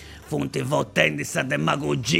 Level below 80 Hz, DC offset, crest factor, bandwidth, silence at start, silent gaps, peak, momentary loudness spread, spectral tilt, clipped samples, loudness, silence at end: -52 dBFS; under 0.1%; 22 dB; 16 kHz; 0 s; none; -2 dBFS; 7 LU; -4.5 dB/octave; under 0.1%; -24 LUFS; 0 s